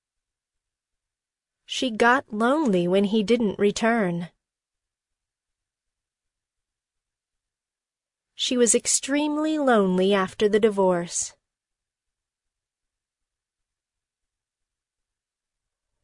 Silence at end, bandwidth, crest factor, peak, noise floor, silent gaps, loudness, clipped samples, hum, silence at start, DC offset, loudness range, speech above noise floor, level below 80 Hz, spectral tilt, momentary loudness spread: 4.75 s; 11 kHz; 20 dB; -6 dBFS; under -90 dBFS; none; -22 LUFS; under 0.1%; none; 1.7 s; under 0.1%; 9 LU; over 68 dB; -64 dBFS; -4 dB/octave; 8 LU